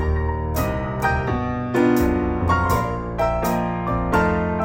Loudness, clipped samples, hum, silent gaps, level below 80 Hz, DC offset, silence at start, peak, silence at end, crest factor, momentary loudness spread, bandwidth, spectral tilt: -21 LUFS; under 0.1%; none; none; -30 dBFS; under 0.1%; 0 s; -6 dBFS; 0 s; 14 dB; 5 LU; 16.5 kHz; -7 dB/octave